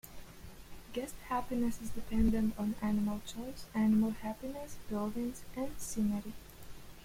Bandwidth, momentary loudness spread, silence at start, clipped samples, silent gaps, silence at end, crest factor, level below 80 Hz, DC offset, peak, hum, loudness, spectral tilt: 16.5 kHz; 22 LU; 0.05 s; under 0.1%; none; 0 s; 18 dB; -48 dBFS; under 0.1%; -18 dBFS; none; -36 LUFS; -6 dB/octave